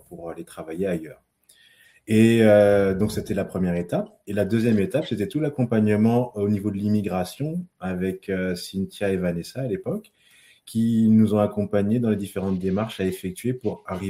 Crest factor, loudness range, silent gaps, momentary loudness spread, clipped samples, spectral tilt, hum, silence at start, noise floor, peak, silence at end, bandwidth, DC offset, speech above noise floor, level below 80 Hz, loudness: 18 dB; 6 LU; none; 12 LU; under 0.1%; -7.5 dB/octave; none; 0.1 s; -57 dBFS; -4 dBFS; 0 s; 15.5 kHz; under 0.1%; 35 dB; -54 dBFS; -23 LUFS